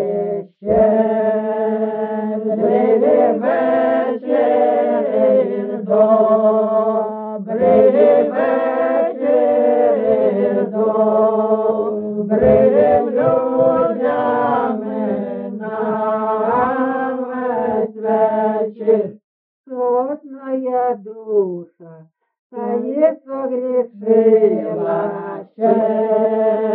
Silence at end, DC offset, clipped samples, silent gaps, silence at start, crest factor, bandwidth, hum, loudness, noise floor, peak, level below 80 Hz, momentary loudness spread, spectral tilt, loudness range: 0 s; under 0.1%; under 0.1%; 19.24-19.64 s, 22.39-22.50 s; 0 s; 14 dB; 4.1 kHz; none; -16 LUFS; -44 dBFS; -2 dBFS; -52 dBFS; 10 LU; -7 dB/octave; 6 LU